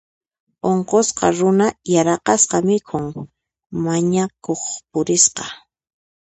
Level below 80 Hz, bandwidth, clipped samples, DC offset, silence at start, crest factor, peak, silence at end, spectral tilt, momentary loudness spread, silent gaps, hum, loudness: -56 dBFS; 9 kHz; under 0.1%; under 0.1%; 0.65 s; 18 dB; 0 dBFS; 0.65 s; -4 dB/octave; 12 LU; none; none; -18 LUFS